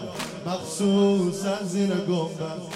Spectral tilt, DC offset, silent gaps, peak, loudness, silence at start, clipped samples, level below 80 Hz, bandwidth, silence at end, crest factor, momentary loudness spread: -5.5 dB/octave; under 0.1%; none; -10 dBFS; -25 LUFS; 0 s; under 0.1%; -64 dBFS; 14 kHz; 0 s; 16 dB; 11 LU